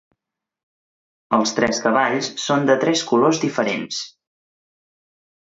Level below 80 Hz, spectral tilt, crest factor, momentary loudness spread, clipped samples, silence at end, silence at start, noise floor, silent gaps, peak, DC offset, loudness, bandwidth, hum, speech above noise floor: -62 dBFS; -4 dB/octave; 20 dB; 8 LU; under 0.1%; 1.5 s; 1.3 s; -80 dBFS; none; -2 dBFS; under 0.1%; -19 LUFS; 8 kHz; none; 61 dB